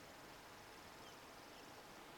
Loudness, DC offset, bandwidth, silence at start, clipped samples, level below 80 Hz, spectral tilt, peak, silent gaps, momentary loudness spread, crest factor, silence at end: -57 LUFS; under 0.1%; 18 kHz; 0 s; under 0.1%; -76 dBFS; -3 dB/octave; -46 dBFS; none; 1 LU; 12 dB; 0 s